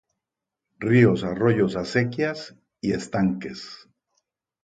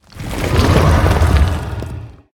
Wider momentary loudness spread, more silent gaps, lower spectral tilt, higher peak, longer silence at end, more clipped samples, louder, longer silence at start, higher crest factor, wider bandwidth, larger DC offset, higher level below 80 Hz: first, 18 LU vs 15 LU; neither; about the same, -7 dB/octave vs -6.5 dB/octave; second, -4 dBFS vs 0 dBFS; first, 0.85 s vs 0.25 s; neither; second, -23 LUFS vs -14 LUFS; first, 0.8 s vs 0.15 s; first, 20 dB vs 14 dB; second, 9.2 kHz vs 17.5 kHz; neither; second, -56 dBFS vs -20 dBFS